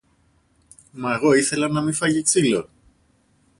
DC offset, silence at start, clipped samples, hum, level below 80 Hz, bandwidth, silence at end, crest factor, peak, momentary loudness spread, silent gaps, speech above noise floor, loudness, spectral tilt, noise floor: under 0.1%; 0.95 s; under 0.1%; none; -58 dBFS; 11.5 kHz; 0.95 s; 18 dB; -6 dBFS; 8 LU; none; 42 dB; -20 LUFS; -4 dB/octave; -62 dBFS